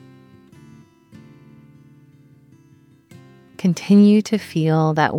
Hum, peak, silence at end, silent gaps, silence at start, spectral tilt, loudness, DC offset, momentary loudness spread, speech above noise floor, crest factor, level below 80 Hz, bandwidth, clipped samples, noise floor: none; -4 dBFS; 0 s; none; 3.6 s; -7 dB/octave; -17 LUFS; under 0.1%; 10 LU; 36 dB; 18 dB; -66 dBFS; 11.5 kHz; under 0.1%; -52 dBFS